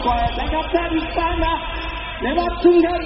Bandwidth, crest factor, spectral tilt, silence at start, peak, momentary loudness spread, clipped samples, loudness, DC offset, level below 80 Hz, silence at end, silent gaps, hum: 5.8 kHz; 16 dB; -4 dB/octave; 0 s; -2 dBFS; 11 LU; under 0.1%; -20 LUFS; under 0.1%; -28 dBFS; 0 s; none; none